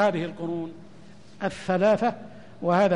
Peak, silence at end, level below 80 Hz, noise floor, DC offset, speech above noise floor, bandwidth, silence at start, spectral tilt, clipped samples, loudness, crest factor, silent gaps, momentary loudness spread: -10 dBFS; 0 s; -62 dBFS; -50 dBFS; 0.4%; 26 dB; 10.5 kHz; 0 s; -7 dB/octave; under 0.1%; -26 LUFS; 14 dB; none; 19 LU